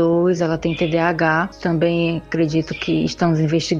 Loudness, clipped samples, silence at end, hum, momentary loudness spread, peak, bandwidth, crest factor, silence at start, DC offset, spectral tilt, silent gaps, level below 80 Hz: -19 LUFS; under 0.1%; 0 s; none; 4 LU; -2 dBFS; 7.6 kHz; 16 dB; 0 s; under 0.1%; -6.5 dB/octave; none; -46 dBFS